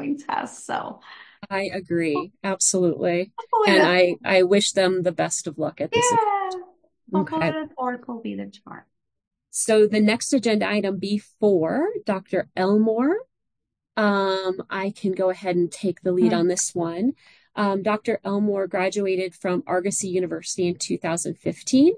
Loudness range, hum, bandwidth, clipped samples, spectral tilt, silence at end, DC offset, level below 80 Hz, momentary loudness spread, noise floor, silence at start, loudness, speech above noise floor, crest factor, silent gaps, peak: 5 LU; none; 10.5 kHz; under 0.1%; -4 dB/octave; 0 s; under 0.1%; -68 dBFS; 11 LU; -82 dBFS; 0 s; -23 LUFS; 60 dB; 18 dB; 9.27-9.31 s; -4 dBFS